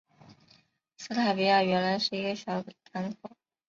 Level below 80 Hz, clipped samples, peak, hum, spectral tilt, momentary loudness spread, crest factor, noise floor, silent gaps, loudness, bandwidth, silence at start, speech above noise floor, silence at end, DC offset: -72 dBFS; under 0.1%; -12 dBFS; none; -5 dB/octave; 19 LU; 18 dB; -64 dBFS; none; -29 LUFS; 7.6 kHz; 0.3 s; 36 dB; 0.4 s; under 0.1%